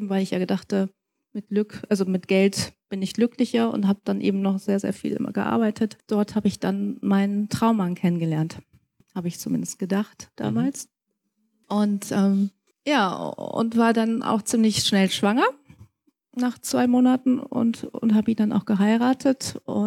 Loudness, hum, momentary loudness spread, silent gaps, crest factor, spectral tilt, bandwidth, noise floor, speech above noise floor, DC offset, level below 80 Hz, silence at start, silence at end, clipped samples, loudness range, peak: -23 LUFS; none; 10 LU; none; 16 dB; -5.5 dB/octave; 15 kHz; -76 dBFS; 53 dB; under 0.1%; -62 dBFS; 0 s; 0 s; under 0.1%; 4 LU; -8 dBFS